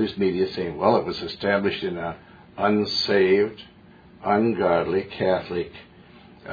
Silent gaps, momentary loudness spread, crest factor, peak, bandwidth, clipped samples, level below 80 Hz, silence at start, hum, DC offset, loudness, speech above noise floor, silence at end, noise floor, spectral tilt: none; 13 LU; 18 dB; -4 dBFS; 5 kHz; under 0.1%; -56 dBFS; 0 s; none; under 0.1%; -23 LUFS; 27 dB; 0 s; -49 dBFS; -6.5 dB/octave